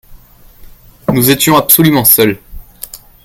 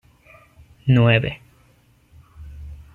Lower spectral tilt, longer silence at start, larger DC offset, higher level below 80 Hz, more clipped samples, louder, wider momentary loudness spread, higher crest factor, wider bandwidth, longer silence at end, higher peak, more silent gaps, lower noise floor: second, -4 dB/octave vs -8.5 dB/octave; second, 0.1 s vs 0.85 s; neither; first, -38 dBFS vs -46 dBFS; first, 0.6% vs under 0.1%; first, -8 LUFS vs -18 LUFS; second, 22 LU vs 25 LU; second, 12 dB vs 20 dB; first, over 20 kHz vs 4.2 kHz; about the same, 0.3 s vs 0.2 s; first, 0 dBFS vs -4 dBFS; neither; second, -38 dBFS vs -56 dBFS